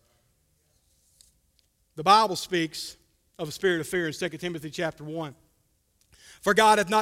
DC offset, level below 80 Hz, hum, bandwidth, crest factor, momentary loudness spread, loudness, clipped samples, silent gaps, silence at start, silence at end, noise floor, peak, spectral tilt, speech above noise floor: under 0.1%; -62 dBFS; none; 16 kHz; 22 dB; 17 LU; -25 LUFS; under 0.1%; none; 1.95 s; 0 s; -69 dBFS; -6 dBFS; -3.5 dB/octave; 44 dB